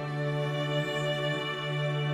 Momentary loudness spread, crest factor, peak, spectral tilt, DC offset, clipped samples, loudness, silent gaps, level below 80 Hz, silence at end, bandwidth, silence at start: 2 LU; 12 dB; -18 dBFS; -6 dB/octave; under 0.1%; under 0.1%; -30 LUFS; none; -68 dBFS; 0 s; 13 kHz; 0 s